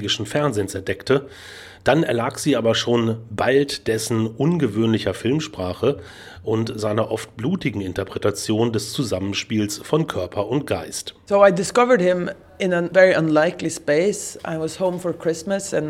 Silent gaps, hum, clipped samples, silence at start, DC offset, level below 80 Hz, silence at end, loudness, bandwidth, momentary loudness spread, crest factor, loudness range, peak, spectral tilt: none; none; under 0.1%; 0 s; under 0.1%; -54 dBFS; 0 s; -21 LUFS; 16 kHz; 11 LU; 20 dB; 5 LU; 0 dBFS; -5 dB/octave